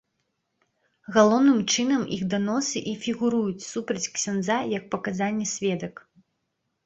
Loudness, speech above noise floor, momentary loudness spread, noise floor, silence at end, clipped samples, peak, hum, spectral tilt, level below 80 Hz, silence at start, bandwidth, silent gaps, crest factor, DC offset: -25 LUFS; 53 dB; 10 LU; -77 dBFS; 0.95 s; under 0.1%; -4 dBFS; none; -4 dB/octave; -64 dBFS; 1.1 s; 8.2 kHz; none; 22 dB; under 0.1%